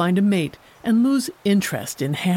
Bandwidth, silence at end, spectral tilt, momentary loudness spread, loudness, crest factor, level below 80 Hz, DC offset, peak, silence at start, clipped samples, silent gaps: 17 kHz; 0 s; -5.5 dB/octave; 8 LU; -21 LUFS; 12 dB; -60 dBFS; under 0.1%; -8 dBFS; 0 s; under 0.1%; none